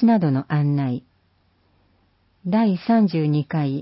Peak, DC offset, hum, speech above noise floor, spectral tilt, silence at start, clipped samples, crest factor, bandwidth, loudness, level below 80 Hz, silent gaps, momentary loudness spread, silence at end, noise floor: -8 dBFS; under 0.1%; none; 44 dB; -13 dB/octave; 0 s; under 0.1%; 14 dB; 5.8 kHz; -21 LUFS; -62 dBFS; none; 8 LU; 0 s; -63 dBFS